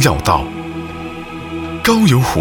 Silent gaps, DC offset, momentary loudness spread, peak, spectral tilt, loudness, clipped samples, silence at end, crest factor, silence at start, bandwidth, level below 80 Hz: none; under 0.1%; 16 LU; 0 dBFS; -5 dB/octave; -16 LUFS; under 0.1%; 0 s; 16 dB; 0 s; 18 kHz; -32 dBFS